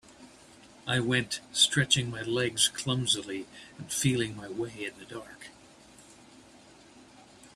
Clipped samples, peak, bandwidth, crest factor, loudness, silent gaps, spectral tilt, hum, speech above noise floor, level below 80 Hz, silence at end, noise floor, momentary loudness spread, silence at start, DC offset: under 0.1%; -8 dBFS; 14.5 kHz; 24 dB; -28 LUFS; none; -3 dB/octave; none; 25 dB; -64 dBFS; 0.05 s; -55 dBFS; 20 LU; 0.1 s; under 0.1%